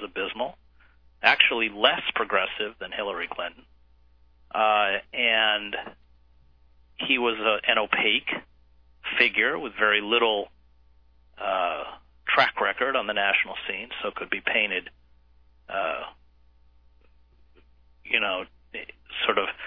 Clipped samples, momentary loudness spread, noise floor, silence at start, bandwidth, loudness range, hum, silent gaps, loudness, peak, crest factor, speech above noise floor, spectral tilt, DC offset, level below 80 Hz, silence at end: under 0.1%; 14 LU; -59 dBFS; 0 s; 5.4 kHz; 8 LU; none; none; -24 LUFS; -2 dBFS; 24 dB; 34 dB; -4.5 dB/octave; under 0.1%; -60 dBFS; 0 s